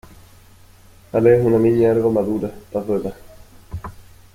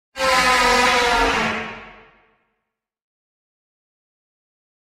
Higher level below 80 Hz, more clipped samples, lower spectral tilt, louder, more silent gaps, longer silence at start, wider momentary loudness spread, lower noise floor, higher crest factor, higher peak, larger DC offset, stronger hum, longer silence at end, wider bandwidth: about the same, -46 dBFS vs -42 dBFS; neither; first, -9 dB/octave vs -2 dB/octave; about the same, -18 LUFS vs -16 LUFS; neither; first, 1.15 s vs 0.15 s; first, 20 LU vs 14 LU; second, -47 dBFS vs -79 dBFS; about the same, 16 dB vs 18 dB; about the same, -2 dBFS vs -4 dBFS; neither; neither; second, 0.35 s vs 3.05 s; about the same, 15.5 kHz vs 16.5 kHz